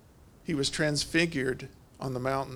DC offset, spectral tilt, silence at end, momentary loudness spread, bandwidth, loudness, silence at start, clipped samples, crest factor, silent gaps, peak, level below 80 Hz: under 0.1%; -4 dB/octave; 0 s; 13 LU; 19.5 kHz; -30 LUFS; 0.25 s; under 0.1%; 20 dB; none; -12 dBFS; -54 dBFS